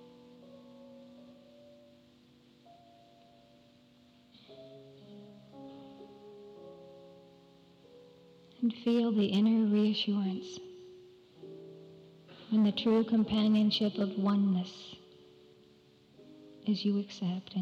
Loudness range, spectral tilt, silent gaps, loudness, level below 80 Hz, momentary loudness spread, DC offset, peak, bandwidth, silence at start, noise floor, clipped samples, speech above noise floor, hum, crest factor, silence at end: 23 LU; -7 dB/octave; none; -30 LUFS; -72 dBFS; 26 LU; under 0.1%; -20 dBFS; 7 kHz; 0.55 s; -62 dBFS; under 0.1%; 33 dB; none; 14 dB; 0 s